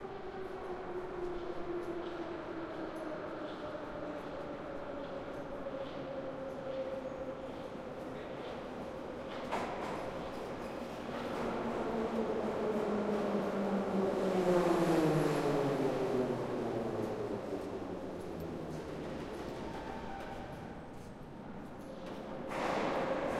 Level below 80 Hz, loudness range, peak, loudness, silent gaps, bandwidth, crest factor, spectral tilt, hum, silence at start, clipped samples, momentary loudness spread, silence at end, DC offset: -58 dBFS; 10 LU; -20 dBFS; -38 LUFS; none; 15.5 kHz; 18 dB; -6.5 dB/octave; none; 0 s; under 0.1%; 12 LU; 0 s; under 0.1%